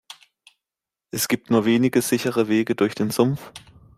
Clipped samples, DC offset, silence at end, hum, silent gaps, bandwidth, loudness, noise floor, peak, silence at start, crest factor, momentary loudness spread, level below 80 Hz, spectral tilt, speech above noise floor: under 0.1%; under 0.1%; 0.4 s; none; none; 16 kHz; -21 LUFS; -88 dBFS; -6 dBFS; 0.1 s; 18 dB; 10 LU; -60 dBFS; -5 dB/octave; 68 dB